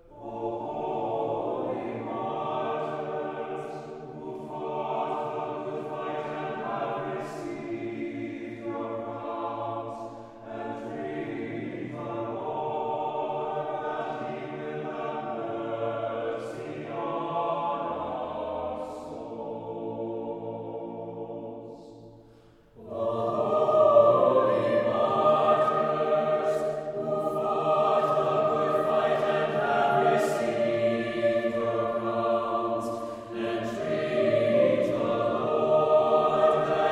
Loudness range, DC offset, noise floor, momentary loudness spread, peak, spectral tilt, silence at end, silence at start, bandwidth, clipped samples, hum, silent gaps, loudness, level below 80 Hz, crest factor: 11 LU; under 0.1%; -55 dBFS; 14 LU; -8 dBFS; -6.5 dB/octave; 0 s; 0.1 s; 11.5 kHz; under 0.1%; none; none; -28 LUFS; -64 dBFS; 20 dB